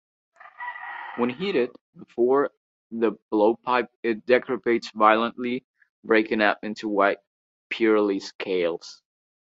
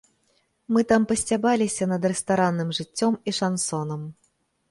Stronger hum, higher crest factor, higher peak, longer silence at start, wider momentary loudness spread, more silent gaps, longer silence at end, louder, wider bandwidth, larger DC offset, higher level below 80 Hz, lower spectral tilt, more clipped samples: neither; about the same, 22 dB vs 18 dB; first, -2 dBFS vs -8 dBFS; second, 0.45 s vs 0.7 s; first, 15 LU vs 8 LU; first, 1.81-1.93 s, 2.57-2.90 s, 3.22-3.29 s, 3.96-4.03 s, 5.64-5.74 s, 5.90-6.03 s, 7.27-7.70 s, 8.35-8.39 s vs none; about the same, 0.5 s vs 0.6 s; about the same, -24 LUFS vs -24 LUFS; second, 7.8 kHz vs 11.5 kHz; neither; second, -70 dBFS vs -60 dBFS; about the same, -5.5 dB/octave vs -4.5 dB/octave; neither